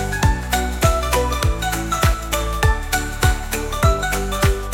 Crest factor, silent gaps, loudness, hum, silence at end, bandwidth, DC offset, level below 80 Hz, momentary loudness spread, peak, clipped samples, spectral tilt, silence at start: 18 dB; none; -20 LUFS; none; 0 s; 17 kHz; under 0.1%; -22 dBFS; 4 LU; 0 dBFS; under 0.1%; -4 dB/octave; 0 s